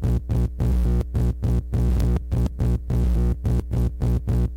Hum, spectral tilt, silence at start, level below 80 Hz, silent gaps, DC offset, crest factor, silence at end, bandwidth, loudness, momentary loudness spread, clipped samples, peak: 60 Hz at -25 dBFS; -9 dB/octave; 0 s; -24 dBFS; none; under 0.1%; 12 dB; 0 s; 10.5 kHz; -24 LUFS; 3 LU; under 0.1%; -10 dBFS